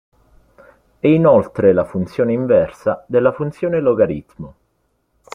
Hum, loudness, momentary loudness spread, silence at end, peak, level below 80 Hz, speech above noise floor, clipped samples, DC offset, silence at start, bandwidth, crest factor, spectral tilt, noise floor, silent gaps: none; -16 LUFS; 11 LU; 0.85 s; -2 dBFS; -50 dBFS; 50 dB; under 0.1%; under 0.1%; 1.05 s; 6.6 kHz; 16 dB; -9 dB/octave; -66 dBFS; none